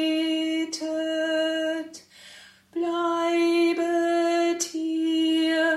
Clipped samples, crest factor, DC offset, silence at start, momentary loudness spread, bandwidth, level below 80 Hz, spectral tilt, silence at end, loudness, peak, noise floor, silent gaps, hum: under 0.1%; 12 dB; under 0.1%; 0 s; 8 LU; 12.5 kHz; -78 dBFS; -1.5 dB/octave; 0 s; -25 LUFS; -12 dBFS; -49 dBFS; none; none